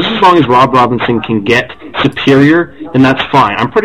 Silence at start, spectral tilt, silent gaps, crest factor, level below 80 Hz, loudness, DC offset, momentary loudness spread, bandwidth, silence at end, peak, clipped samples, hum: 0 s; -6.5 dB/octave; none; 10 dB; -40 dBFS; -9 LUFS; 1%; 7 LU; 11.5 kHz; 0 s; 0 dBFS; 1%; none